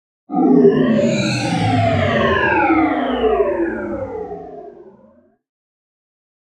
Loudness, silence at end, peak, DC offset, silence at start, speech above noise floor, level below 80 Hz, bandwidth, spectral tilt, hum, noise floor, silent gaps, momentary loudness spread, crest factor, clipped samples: -16 LUFS; 1.65 s; 0 dBFS; under 0.1%; 0.3 s; 37 dB; -44 dBFS; 10.5 kHz; -6.5 dB/octave; none; -51 dBFS; none; 16 LU; 18 dB; under 0.1%